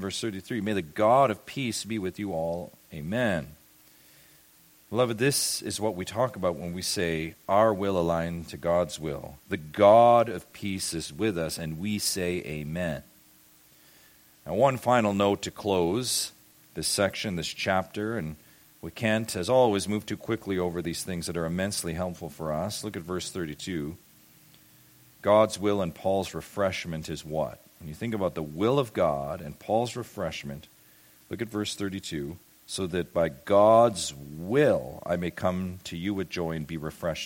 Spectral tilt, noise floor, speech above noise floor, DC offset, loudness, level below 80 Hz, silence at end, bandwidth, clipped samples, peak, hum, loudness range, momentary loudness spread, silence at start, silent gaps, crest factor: -4.5 dB/octave; -58 dBFS; 31 dB; under 0.1%; -28 LUFS; -56 dBFS; 0 s; 17 kHz; under 0.1%; -6 dBFS; none; 8 LU; 13 LU; 0 s; none; 22 dB